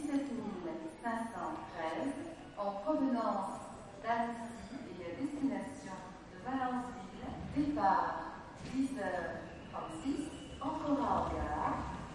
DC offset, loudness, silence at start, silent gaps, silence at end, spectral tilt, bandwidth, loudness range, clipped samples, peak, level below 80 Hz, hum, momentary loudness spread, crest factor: under 0.1%; -38 LUFS; 0 s; none; 0 s; -6 dB/octave; 11.5 kHz; 3 LU; under 0.1%; -20 dBFS; -58 dBFS; none; 13 LU; 18 dB